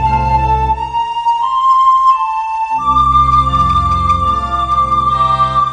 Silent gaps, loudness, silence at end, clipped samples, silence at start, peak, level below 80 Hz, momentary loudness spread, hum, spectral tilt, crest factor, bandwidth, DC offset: none; -12 LUFS; 0 s; under 0.1%; 0 s; 0 dBFS; -26 dBFS; 7 LU; none; -6 dB/octave; 12 dB; 10 kHz; under 0.1%